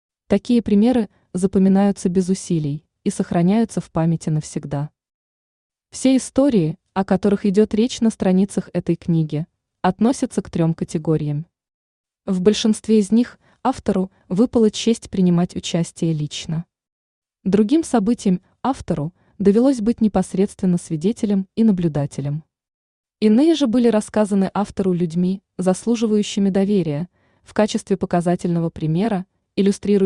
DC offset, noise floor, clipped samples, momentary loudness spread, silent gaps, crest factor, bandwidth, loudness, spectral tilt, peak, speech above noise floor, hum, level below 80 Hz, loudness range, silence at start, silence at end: under 0.1%; under -90 dBFS; under 0.1%; 10 LU; 5.14-5.70 s, 11.74-12.04 s, 16.92-17.22 s, 22.74-23.04 s; 16 dB; 11 kHz; -19 LUFS; -7 dB/octave; -2 dBFS; over 72 dB; none; -50 dBFS; 3 LU; 0.3 s; 0 s